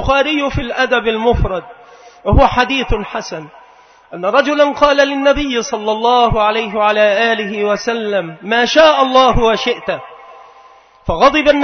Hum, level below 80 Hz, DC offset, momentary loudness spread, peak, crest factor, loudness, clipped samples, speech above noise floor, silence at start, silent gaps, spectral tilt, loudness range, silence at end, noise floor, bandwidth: none; -28 dBFS; under 0.1%; 12 LU; 0 dBFS; 14 dB; -13 LUFS; under 0.1%; 31 dB; 0 s; none; -5 dB/octave; 3 LU; 0 s; -44 dBFS; 6.6 kHz